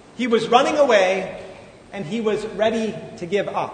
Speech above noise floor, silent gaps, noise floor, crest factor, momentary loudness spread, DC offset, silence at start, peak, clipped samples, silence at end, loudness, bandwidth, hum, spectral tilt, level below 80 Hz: 21 dB; none; -41 dBFS; 20 dB; 17 LU; under 0.1%; 0.15 s; 0 dBFS; under 0.1%; 0 s; -20 LUFS; 9.6 kHz; none; -4.5 dB/octave; -58 dBFS